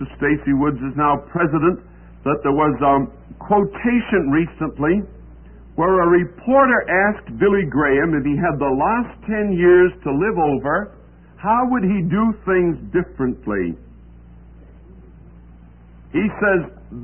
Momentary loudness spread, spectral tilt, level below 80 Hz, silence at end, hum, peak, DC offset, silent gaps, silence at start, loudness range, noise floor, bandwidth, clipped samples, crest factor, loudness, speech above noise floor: 9 LU; -12.5 dB/octave; -40 dBFS; 0 s; none; -4 dBFS; 0.1%; none; 0 s; 8 LU; -43 dBFS; 3.3 kHz; under 0.1%; 14 dB; -18 LUFS; 26 dB